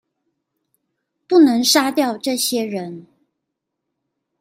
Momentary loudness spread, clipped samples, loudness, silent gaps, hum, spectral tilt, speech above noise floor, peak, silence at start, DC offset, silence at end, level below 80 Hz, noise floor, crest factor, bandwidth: 14 LU; under 0.1%; -16 LUFS; none; none; -2.5 dB/octave; 62 dB; -2 dBFS; 1.3 s; under 0.1%; 1.4 s; -70 dBFS; -79 dBFS; 18 dB; 16 kHz